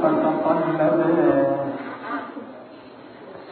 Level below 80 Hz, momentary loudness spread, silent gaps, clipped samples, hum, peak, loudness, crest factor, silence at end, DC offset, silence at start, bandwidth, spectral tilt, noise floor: -64 dBFS; 23 LU; none; under 0.1%; none; -8 dBFS; -21 LUFS; 16 dB; 0 s; under 0.1%; 0 s; 4.5 kHz; -12 dB/octave; -42 dBFS